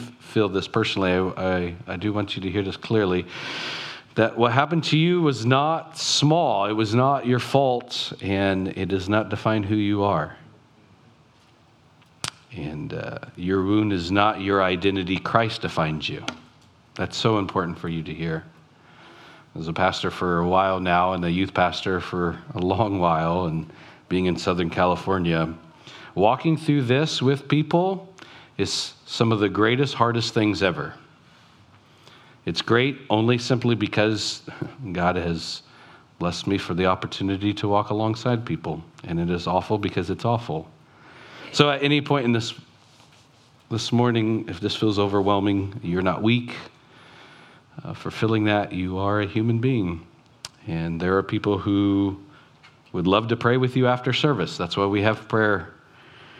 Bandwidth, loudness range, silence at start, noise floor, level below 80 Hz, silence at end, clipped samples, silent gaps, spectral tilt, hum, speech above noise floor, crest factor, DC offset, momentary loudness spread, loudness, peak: 12.5 kHz; 5 LU; 0 s; -56 dBFS; -54 dBFS; 0 s; under 0.1%; none; -6 dB/octave; none; 33 dB; 24 dB; under 0.1%; 12 LU; -23 LUFS; 0 dBFS